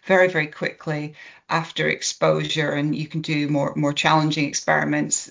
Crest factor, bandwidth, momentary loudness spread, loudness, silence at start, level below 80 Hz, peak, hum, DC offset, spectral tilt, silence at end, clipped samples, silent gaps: 18 dB; 7.8 kHz; 9 LU; -22 LUFS; 0.05 s; -62 dBFS; -4 dBFS; none; under 0.1%; -4 dB/octave; 0.05 s; under 0.1%; none